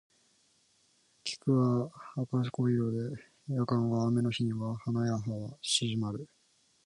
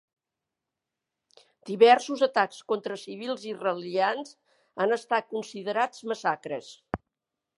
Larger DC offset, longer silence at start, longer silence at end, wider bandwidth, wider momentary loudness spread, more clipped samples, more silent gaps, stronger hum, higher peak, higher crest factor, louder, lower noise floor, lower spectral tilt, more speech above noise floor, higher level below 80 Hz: neither; second, 1.25 s vs 1.65 s; about the same, 0.6 s vs 0.65 s; about the same, 11.5 kHz vs 11.5 kHz; second, 10 LU vs 17 LU; neither; neither; neither; second, -14 dBFS vs -6 dBFS; second, 18 dB vs 24 dB; second, -32 LUFS vs -27 LUFS; second, -70 dBFS vs -87 dBFS; first, -6 dB/octave vs -4 dB/octave; second, 39 dB vs 61 dB; second, -68 dBFS vs -62 dBFS